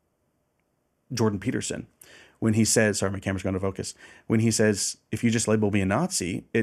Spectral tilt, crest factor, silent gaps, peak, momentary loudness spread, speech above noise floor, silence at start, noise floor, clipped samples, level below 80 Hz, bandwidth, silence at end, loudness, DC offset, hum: -4.5 dB/octave; 18 dB; none; -8 dBFS; 12 LU; 47 dB; 1.1 s; -73 dBFS; under 0.1%; -60 dBFS; 14.5 kHz; 0 s; -25 LUFS; under 0.1%; none